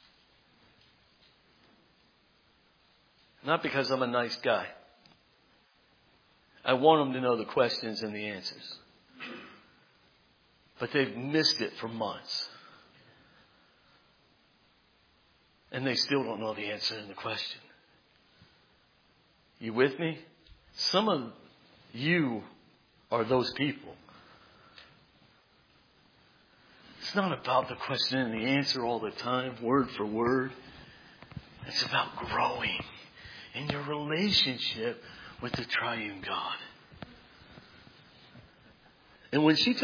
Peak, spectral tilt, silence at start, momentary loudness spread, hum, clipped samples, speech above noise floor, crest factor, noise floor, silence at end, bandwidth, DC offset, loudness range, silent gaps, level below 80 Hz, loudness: -8 dBFS; -5 dB/octave; 3.45 s; 22 LU; none; under 0.1%; 36 dB; 24 dB; -66 dBFS; 0 s; 5.4 kHz; under 0.1%; 9 LU; none; -66 dBFS; -30 LUFS